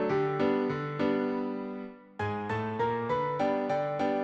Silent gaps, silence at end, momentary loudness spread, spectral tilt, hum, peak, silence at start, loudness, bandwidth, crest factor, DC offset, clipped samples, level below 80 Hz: none; 0 s; 9 LU; -8 dB/octave; none; -16 dBFS; 0 s; -31 LUFS; 8 kHz; 14 dB; under 0.1%; under 0.1%; -64 dBFS